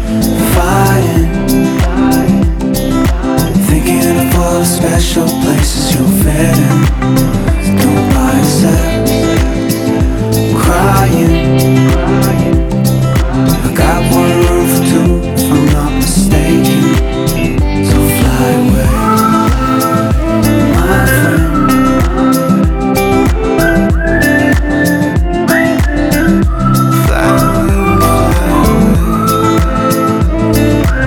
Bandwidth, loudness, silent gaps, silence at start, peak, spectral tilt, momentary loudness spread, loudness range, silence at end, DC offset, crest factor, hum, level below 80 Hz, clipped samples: 20 kHz; -10 LUFS; none; 0 s; 0 dBFS; -6 dB/octave; 3 LU; 1 LU; 0 s; under 0.1%; 10 dB; none; -16 dBFS; under 0.1%